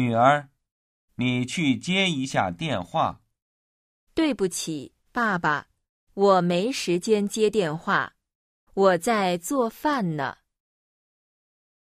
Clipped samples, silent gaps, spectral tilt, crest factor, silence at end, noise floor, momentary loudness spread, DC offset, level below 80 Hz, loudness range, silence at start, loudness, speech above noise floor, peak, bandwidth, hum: under 0.1%; 0.71-1.08 s, 3.42-4.07 s, 5.89-6.07 s, 8.35-8.67 s; -5 dB/octave; 20 dB; 1.5 s; under -90 dBFS; 11 LU; under 0.1%; -60 dBFS; 4 LU; 0 s; -24 LUFS; over 67 dB; -6 dBFS; 15.5 kHz; none